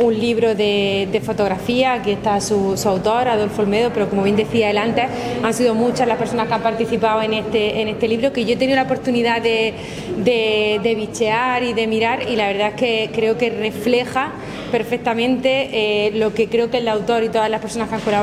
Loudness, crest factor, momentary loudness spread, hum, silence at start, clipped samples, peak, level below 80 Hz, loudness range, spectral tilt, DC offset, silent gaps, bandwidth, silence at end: -18 LUFS; 16 dB; 4 LU; none; 0 s; under 0.1%; -2 dBFS; -48 dBFS; 1 LU; -5 dB/octave; under 0.1%; none; 15 kHz; 0 s